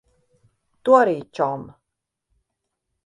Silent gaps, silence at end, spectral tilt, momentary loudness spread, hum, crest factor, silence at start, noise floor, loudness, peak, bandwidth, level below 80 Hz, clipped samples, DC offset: none; 1.4 s; -6.5 dB/octave; 13 LU; none; 22 dB; 0.85 s; -82 dBFS; -20 LUFS; -2 dBFS; 11 kHz; -66 dBFS; under 0.1%; under 0.1%